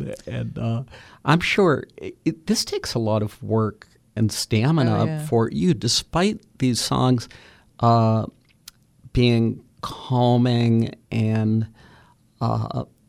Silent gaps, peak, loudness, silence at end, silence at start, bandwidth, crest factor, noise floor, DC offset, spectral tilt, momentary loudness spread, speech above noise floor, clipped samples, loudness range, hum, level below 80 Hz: none; -4 dBFS; -22 LUFS; 0.25 s; 0 s; 15 kHz; 18 dB; -54 dBFS; under 0.1%; -5.5 dB/octave; 12 LU; 33 dB; under 0.1%; 2 LU; none; -46 dBFS